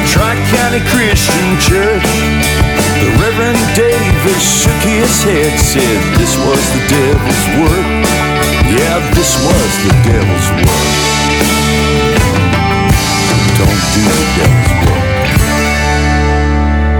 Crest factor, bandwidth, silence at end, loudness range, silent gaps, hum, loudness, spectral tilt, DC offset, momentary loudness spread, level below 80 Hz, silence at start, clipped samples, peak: 10 dB; 20 kHz; 0 s; 1 LU; none; none; -10 LUFS; -4.5 dB/octave; under 0.1%; 2 LU; -18 dBFS; 0 s; under 0.1%; 0 dBFS